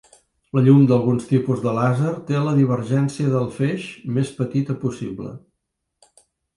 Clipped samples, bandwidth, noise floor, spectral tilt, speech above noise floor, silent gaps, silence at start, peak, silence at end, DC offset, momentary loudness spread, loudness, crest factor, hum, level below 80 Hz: under 0.1%; 11.5 kHz; -77 dBFS; -8.5 dB/octave; 58 dB; none; 0.55 s; -4 dBFS; 1.2 s; under 0.1%; 12 LU; -20 LUFS; 16 dB; none; -58 dBFS